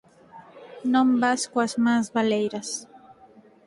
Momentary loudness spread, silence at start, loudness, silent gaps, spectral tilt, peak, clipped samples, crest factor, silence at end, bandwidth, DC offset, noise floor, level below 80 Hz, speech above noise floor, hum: 12 LU; 0.35 s; -24 LUFS; none; -4 dB/octave; -10 dBFS; under 0.1%; 16 dB; 0.7 s; 11.5 kHz; under 0.1%; -53 dBFS; -70 dBFS; 30 dB; none